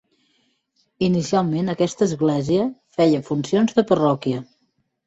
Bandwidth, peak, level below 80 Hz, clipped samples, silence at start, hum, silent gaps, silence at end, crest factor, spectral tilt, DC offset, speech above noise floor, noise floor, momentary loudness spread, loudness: 8.2 kHz; -4 dBFS; -58 dBFS; under 0.1%; 1 s; none; none; 0.65 s; 18 dB; -6.5 dB/octave; under 0.1%; 50 dB; -69 dBFS; 6 LU; -20 LUFS